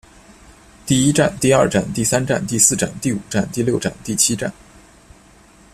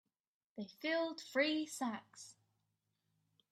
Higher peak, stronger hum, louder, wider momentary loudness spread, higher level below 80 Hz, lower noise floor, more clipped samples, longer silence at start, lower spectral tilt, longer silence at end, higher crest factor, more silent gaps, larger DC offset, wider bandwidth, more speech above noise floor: first, 0 dBFS vs -22 dBFS; neither; first, -17 LUFS vs -39 LUFS; second, 9 LU vs 20 LU; first, -46 dBFS vs under -90 dBFS; second, -48 dBFS vs -85 dBFS; neither; first, 0.85 s vs 0.55 s; about the same, -4 dB/octave vs -3 dB/octave; about the same, 1.2 s vs 1.2 s; about the same, 20 dB vs 20 dB; neither; neither; about the same, 15 kHz vs 15 kHz; second, 30 dB vs 45 dB